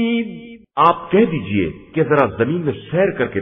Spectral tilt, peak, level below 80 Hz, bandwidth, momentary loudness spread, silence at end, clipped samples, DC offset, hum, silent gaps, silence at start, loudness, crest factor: -9.5 dB/octave; 0 dBFS; -48 dBFS; 5.2 kHz; 8 LU; 0 s; under 0.1%; under 0.1%; none; none; 0 s; -18 LUFS; 18 dB